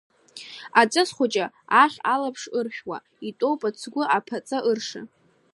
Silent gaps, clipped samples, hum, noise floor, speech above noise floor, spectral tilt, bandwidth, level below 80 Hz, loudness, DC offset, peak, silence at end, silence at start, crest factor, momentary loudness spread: none; under 0.1%; none; -43 dBFS; 20 dB; -3 dB/octave; 11.5 kHz; -78 dBFS; -23 LUFS; under 0.1%; -2 dBFS; 0.5 s; 0.35 s; 22 dB; 18 LU